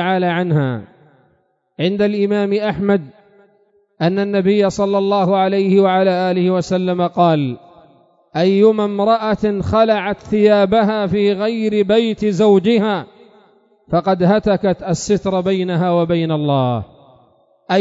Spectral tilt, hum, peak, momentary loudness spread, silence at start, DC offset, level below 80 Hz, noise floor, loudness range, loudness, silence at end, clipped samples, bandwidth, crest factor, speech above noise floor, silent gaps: -7 dB/octave; none; 0 dBFS; 7 LU; 0 s; under 0.1%; -48 dBFS; -61 dBFS; 4 LU; -16 LUFS; 0 s; under 0.1%; 7.8 kHz; 16 dB; 46 dB; none